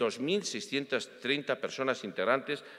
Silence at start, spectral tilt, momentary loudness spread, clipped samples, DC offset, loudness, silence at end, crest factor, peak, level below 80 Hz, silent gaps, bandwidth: 0 s; -3.5 dB/octave; 4 LU; under 0.1%; under 0.1%; -32 LUFS; 0 s; 22 dB; -12 dBFS; -86 dBFS; none; 13.5 kHz